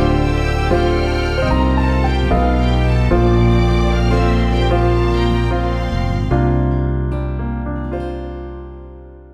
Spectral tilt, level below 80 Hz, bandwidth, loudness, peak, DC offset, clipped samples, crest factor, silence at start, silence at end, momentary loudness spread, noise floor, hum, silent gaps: -7.5 dB/octave; -20 dBFS; 9 kHz; -17 LUFS; -2 dBFS; under 0.1%; under 0.1%; 12 dB; 0 s; 0.05 s; 10 LU; -36 dBFS; none; none